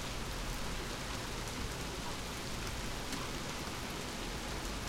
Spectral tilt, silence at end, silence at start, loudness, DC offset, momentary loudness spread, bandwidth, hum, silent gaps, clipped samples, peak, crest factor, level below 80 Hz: -3.5 dB/octave; 0 s; 0 s; -40 LUFS; under 0.1%; 1 LU; 16.5 kHz; none; none; under 0.1%; -24 dBFS; 16 dB; -46 dBFS